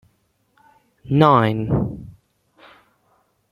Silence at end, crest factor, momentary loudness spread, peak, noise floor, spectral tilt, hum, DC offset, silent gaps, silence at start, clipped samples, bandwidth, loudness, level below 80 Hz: 1.4 s; 20 dB; 14 LU; -2 dBFS; -66 dBFS; -9 dB/octave; none; under 0.1%; none; 1.05 s; under 0.1%; 12 kHz; -18 LUFS; -46 dBFS